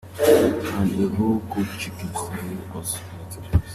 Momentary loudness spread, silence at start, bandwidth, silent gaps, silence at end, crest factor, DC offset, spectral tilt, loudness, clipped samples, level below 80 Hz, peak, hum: 14 LU; 0.05 s; 15 kHz; none; 0 s; 20 dB; under 0.1%; -6 dB/octave; -23 LUFS; under 0.1%; -40 dBFS; -4 dBFS; none